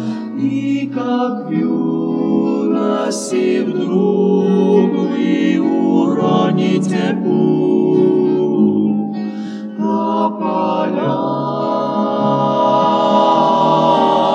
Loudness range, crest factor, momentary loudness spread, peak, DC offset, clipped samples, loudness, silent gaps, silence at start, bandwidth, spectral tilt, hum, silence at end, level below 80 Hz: 3 LU; 14 dB; 6 LU; 0 dBFS; under 0.1%; under 0.1%; -15 LUFS; none; 0 s; 11 kHz; -7 dB/octave; none; 0 s; -70 dBFS